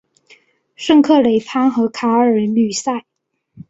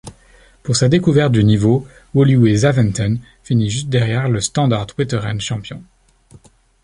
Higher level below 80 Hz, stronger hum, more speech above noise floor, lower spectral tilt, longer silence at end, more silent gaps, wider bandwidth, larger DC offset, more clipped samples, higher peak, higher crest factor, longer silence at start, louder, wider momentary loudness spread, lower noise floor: second, -60 dBFS vs -42 dBFS; neither; first, 37 dB vs 33 dB; about the same, -5 dB/octave vs -6 dB/octave; second, 0.1 s vs 1 s; neither; second, 8 kHz vs 11 kHz; neither; neither; about the same, -2 dBFS vs -2 dBFS; about the same, 14 dB vs 14 dB; first, 0.8 s vs 0.05 s; about the same, -15 LUFS vs -16 LUFS; about the same, 11 LU vs 11 LU; about the same, -51 dBFS vs -48 dBFS